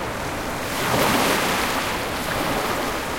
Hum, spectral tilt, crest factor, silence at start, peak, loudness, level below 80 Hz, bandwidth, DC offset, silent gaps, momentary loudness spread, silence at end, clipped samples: none; -3 dB/octave; 18 dB; 0 s; -6 dBFS; -22 LUFS; -42 dBFS; 16.5 kHz; under 0.1%; none; 8 LU; 0 s; under 0.1%